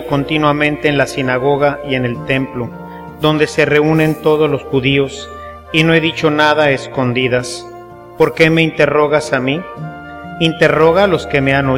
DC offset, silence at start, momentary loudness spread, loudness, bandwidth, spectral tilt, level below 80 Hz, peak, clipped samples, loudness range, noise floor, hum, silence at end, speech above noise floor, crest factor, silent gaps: under 0.1%; 0 s; 17 LU; -13 LUFS; 16.5 kHz; -6 dB/octave; -42 dBFS; 0 dBFS; under 0.1%; 2 LU; -34 dBFS; none; 0 s; 20 dB; 14 dB; none